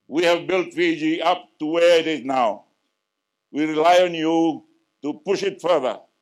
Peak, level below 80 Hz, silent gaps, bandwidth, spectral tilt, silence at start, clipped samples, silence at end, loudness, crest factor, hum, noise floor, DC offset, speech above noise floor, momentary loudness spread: -6 dBFS; -74 dBFS; none; 13 kHz; -4.5 dB/octave; 0.1 s; under 0.1%; 0.25 s; -20 LUFS; 16 dB; none; -79 dBFS; under 0.1%; 59 dB; 13 LU